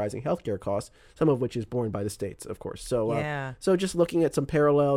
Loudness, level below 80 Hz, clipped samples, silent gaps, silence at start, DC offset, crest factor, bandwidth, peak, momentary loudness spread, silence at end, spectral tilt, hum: -28 LUFS; -52 dBFS; under 0.1%; none; 0 s; under 0.1%; 16 dB; 16 kHz; -10 dBFS; 11 LU; 0 s; -6.5 dB/octave; none